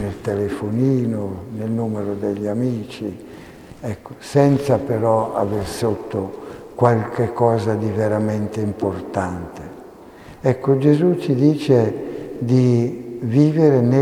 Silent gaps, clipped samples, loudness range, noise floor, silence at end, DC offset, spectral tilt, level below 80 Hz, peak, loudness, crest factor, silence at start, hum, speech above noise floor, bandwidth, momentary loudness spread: none; under 0.1%; 5 LU; -41 dBFS; 0 s; under 0.1%; -8 dB/octave; -50 dBFS; 0 dBFS; -19 LUFS; 20 dB; 0 s; none; 22 dB; 14.5 kHz; 15 LU